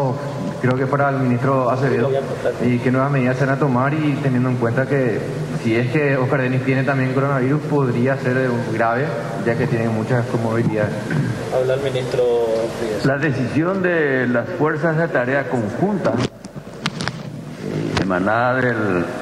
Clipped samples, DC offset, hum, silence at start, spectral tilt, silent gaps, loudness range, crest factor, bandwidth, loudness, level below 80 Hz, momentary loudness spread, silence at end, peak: under 0.1%; under 0.1%; none; 0 s; -7.5 dB/octave; none; 3 LU; 18 dB; 12.5 kHz; -19 LUFS; -50 dBFS; 6 LU; 0 s; 0 dBFS